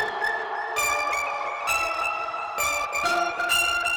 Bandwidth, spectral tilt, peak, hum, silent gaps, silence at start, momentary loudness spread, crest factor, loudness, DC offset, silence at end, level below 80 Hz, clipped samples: over 20 kHz; 0 dB/octave; -12 dBFS; none; none; 0 s; 7 LU; 14 dB; -24 LUFS; under 0.1%; 0 s; -54 dBFS; under 0.1%